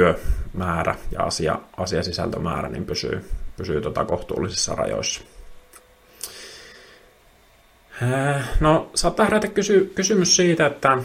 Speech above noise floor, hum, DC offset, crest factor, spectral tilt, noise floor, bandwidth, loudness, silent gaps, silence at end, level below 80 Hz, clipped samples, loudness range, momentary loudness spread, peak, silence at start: 33 dB; none; under 0.1%; 20 dB; -4 dB/octave; -54 dBFS; 16 kHz; -22 LUFS; none; 0 s; -34 dBFS; under 0.1%; 10 LU; 15 LU; -2 dBFS; 0 s